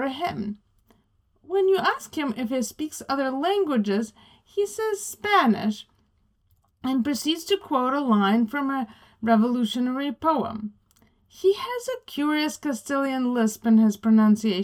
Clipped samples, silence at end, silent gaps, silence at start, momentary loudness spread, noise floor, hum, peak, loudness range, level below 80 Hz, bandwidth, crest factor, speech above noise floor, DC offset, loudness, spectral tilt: under 0.1%; 0 s; none; 0 s; 12 LU; -66 dBFS; none; -6 dBFS; 3 LU; -64 dBFS; 19 kHz; 18 dB; 43 dB; under 0.1%; -24 LUFS; -5 dB/octave